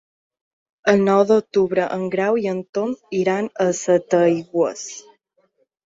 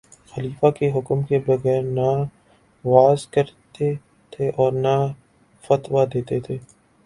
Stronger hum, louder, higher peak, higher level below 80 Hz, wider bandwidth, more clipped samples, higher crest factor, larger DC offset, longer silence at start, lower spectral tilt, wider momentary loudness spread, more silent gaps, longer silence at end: neither; about the same, -19 LUFS vs -21 LUFS; about the same, -2 dBFS vs 0 dBFS; second, -64 dBFS vs -56 dBFS; second, 7.8 kHz vs 11.5 kHz; neither; about the same, 18 dB vs 20 dB; neither; first, 0.85 s vs 0.35 s; second, -5.5 dB/octave vs -8 dB/octave; second, 9 LU vs 14 LU; first, 2.69-2.73 s vs none; first, 0.85 s vs 0.45 s